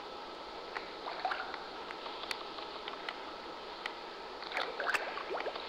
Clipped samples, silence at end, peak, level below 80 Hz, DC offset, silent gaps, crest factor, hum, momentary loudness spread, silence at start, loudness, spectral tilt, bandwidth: under 0.1%; 0 s; -22 dBFS; -70 dBFS; under 0.1%; none; 20 dB; none; 10 LU; 0 s; -40 LUFS; -2 dB/octave; 16.5 kHz